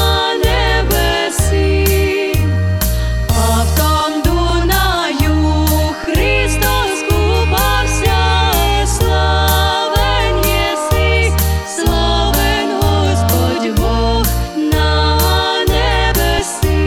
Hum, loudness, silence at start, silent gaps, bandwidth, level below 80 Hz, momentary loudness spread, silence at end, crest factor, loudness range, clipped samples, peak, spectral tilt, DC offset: none; -14 LUFS; 0 s; none; 17.5 kHz; -18 dBFS; 3 LU; 0 s; 12 dB; 1 LU; under 0.1%; 0 dBFS; -4.5 dB/octave; 0.1%